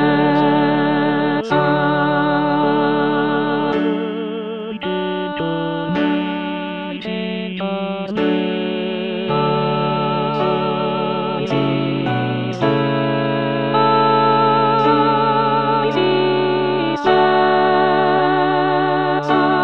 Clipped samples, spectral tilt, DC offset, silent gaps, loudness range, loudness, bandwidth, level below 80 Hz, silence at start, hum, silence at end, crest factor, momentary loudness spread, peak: under 0.1%; -8 dB/octave; 0.5%; none; 6 LU; -17 LUFS; 6.6 kHz; -58 dBFS; 0 s; none; 0 s; 14 dB; 9 LU; -2 dBFS